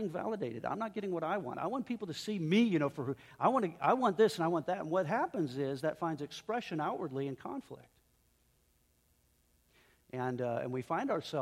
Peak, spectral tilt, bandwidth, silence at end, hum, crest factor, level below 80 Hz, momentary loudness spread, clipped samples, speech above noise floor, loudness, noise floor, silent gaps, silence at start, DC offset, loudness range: -14 dBFS; -6.5 dB/octave; 15.5 kHz; 0 s; none; 20 dB; -74 dBFS; 10 LU; under 0.1%; 38 dB; -35 LUFS; -72 dBFS; none; 0 s; under 0.1%; 12 LU